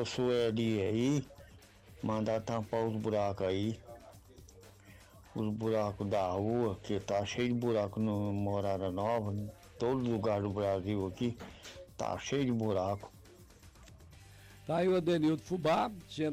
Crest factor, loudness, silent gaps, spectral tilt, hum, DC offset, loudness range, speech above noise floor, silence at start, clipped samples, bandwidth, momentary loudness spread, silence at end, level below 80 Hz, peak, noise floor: 10 dB; -34 LUFS; none; -6.5 dB/octave; none; under 0.1%; 3 LU; 24 dB; 0 s; under 0.1%; 15.5 kHz; 10 LU; 0 s; -62 dBFS; -24 dBFS; -57 dBFS